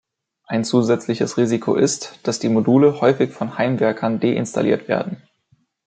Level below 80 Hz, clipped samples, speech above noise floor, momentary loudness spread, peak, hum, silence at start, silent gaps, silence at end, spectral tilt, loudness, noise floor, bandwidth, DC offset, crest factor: -64 dBFS; under 0.1%; 44 dB; 9 LU; -2 dBFS; none; 0.5 s; none; 0.7 s; -5.5 dB/octave; -19 LUFS; -62 dBFS; 9.4 kHz; under 0.1%; 16 dB